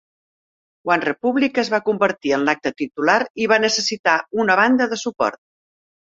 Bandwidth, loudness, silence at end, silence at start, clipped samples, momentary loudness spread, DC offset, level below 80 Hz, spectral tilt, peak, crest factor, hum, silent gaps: 7.8 kHz; -19 LUFS; 0.7 s; 0.85 s; under 0.1%; 7 LU; under 0.1%; -64 dBFS; -3.5 dB/octave; -2 dBFS; 18 dB; none; 3.30-3.35 s, 3.99-4.04 s